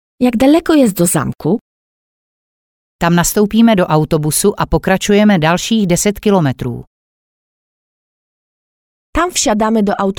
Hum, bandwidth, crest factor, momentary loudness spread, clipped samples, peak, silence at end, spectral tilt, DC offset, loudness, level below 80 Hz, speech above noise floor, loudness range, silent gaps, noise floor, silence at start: none; 19.5 kHz; 14 dB; 8 LU; under 0.1%; 0 dBFS; 0.05 s; -5 dB/octave; under 0.1%; -13 LUFS; -34 dBFS; over 78 dB; 8 LU; 1.61-2.99 s, 6.87-9.13 s; under -90 dBFS; 0.2 s